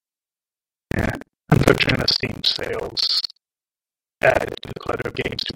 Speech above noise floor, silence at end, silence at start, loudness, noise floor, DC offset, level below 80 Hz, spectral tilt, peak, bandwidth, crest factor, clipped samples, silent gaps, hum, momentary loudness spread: over 68 dB; 0.05 s; 0.95 s; -21 LUFS; under -90 dBFS; under 0.1%; -40 dBFS; -5 dB/octave; 0 dBFS; 17 kHz; 22 dB; under 0.1%; none; none; 12 LU